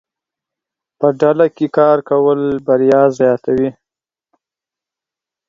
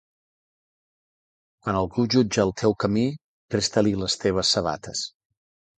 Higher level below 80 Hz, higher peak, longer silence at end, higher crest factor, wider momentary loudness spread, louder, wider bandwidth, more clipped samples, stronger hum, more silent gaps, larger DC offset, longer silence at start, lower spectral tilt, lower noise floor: second, -56 dBFS vs -50 dBFS; first, 0 dBFS vs -6 dBFS; first, 1.75 s vs 0.7 s; about the same, 16 dB vs 20 dB; second, 6 LU vs 10 LU; first, -14 LUFS vs -24 LUFS; second, 7.4 kHz vs 9.6 kHz; neither; neither; second, none vs 3.24-3.49 s; neither; second, 1 s vs 1.65 s; first, -8 dB/octave vs -4.5 dB/octave; about the same, -89 dBFS vs under -90 dBFS